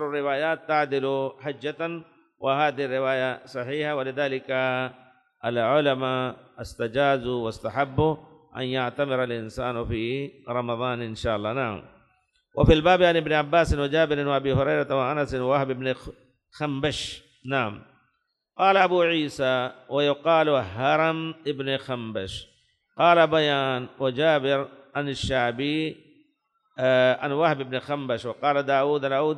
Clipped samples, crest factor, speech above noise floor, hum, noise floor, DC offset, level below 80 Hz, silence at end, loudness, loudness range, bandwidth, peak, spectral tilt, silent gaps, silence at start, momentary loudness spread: under 0.1%; 20 dB; 50 dB; none; -75 dBFS; under 0.1%; -44 dBFS; 0 s; -25 LUFS; 5 LU; 11.5 kHz; -6 dBFS; -6 dB/octave; none; 0 s; 12 LU